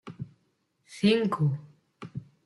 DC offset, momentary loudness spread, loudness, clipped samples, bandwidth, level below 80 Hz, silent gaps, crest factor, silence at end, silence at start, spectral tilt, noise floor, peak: under 0.1%; 22 LU; -27 LUFS; under 0.1%; 12 kHz; -68 dBFS; none; 20 dB; 0.25 s; 0.05 s; -7 dB/octave; -73 dBFS; -10 dBFS